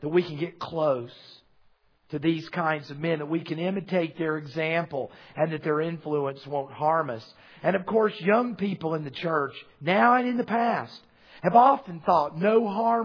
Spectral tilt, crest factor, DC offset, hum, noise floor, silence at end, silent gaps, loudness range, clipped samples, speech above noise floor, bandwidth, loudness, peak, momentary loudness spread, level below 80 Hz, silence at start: -8 dB/octave; 22 dB; under 0.1%; none; -62 dBFS; 0 s; none; 6 LU; under 0.1%; 36 dB; 5.4 kHz; -26 LUFS; -4 dBFS; 12 LU; -70 dBFS; 0 s